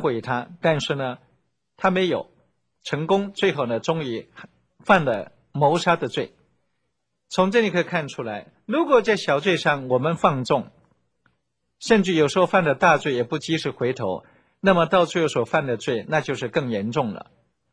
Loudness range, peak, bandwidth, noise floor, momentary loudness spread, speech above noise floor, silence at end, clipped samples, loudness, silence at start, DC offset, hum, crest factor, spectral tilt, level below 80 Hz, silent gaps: 4 LU; -2 dBFS; 10.5 kHz; -77 dBFS; 12 LU; 56 dB; 0.55 s; under 0.1%; -22 LUFS; 0 s; under 0.1%; none; 20 dB; -5.5 dB/octave; -60 dBFS; none